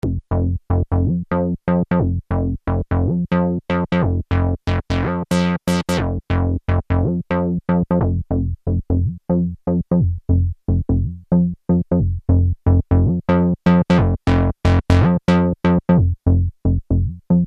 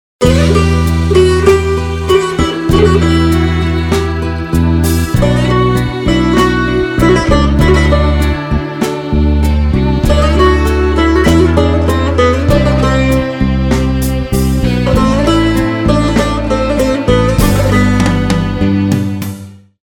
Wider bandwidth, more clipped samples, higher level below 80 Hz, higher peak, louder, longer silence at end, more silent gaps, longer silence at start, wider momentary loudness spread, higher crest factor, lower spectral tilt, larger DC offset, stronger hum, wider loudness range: second, 10 kHz vs 19 kHz; second, under 0.1% vs 0.3%; second, -28 dBFS vs -18 dBFS; about the same, -2 dBFS vs 0 dBFS; second, -19 LUFS vs -11 LUFS; second, 0 s vs 0.45 s; neither; second, 0.05 s vs 0.2 s; about the same, 6 LU vs 5 LU; first, 16 dB vs 10 dB; first, -8.5 dB/octave vs -6.5 dB/octave; neither; neither; about the same, 4 LU vs 2 LU